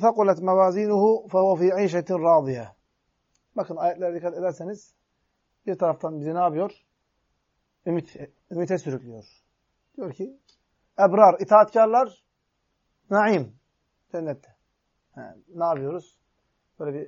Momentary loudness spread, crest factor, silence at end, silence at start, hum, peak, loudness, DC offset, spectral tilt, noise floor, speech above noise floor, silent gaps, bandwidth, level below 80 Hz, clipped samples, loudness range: 20 LU; 22 dB; 0 s; 0 s; none; -2 dBFS; -22 LUFS; under 0.1%; -7.5 dB/octave; -75 dBFS; 53 dB; none; 7.4 kHz; -74 dBFS; under 0.1%; 12 LU